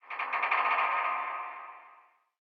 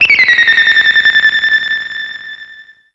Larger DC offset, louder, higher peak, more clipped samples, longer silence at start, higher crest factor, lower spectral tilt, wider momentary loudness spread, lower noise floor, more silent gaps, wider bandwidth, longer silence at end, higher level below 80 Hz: neither; second, -30 LUFS vs -7 LUFS; second, -14 dBFS vs 0 dBFS; neither; about the same, 0.05 s vs 0 s; first, 18 dB vs 10 dB; about the same, -0.5 dB/octave vs 0 dB/octave; second, 16 LU vs 19 LU; first, -61 dBFS vs -37 dBFS; neither; second, 6.2 kHz vs 8 kHz; first, 0.5 s vs 0.3 s; second, under -90 dBFS vs -52 dBFS